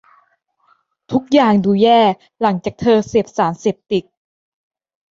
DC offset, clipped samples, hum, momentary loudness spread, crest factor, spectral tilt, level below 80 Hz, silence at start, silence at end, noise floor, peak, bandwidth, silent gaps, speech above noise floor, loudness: under 0.1%; under 0.1%; none; 10 LU; 16 dB; -6.5 dB/octave; -52 dBFS; 1.1 s; 1.1 s; -61 dBFS; -2 dBFS; 7.6 kHz; none; 46 dB; -16 LUFS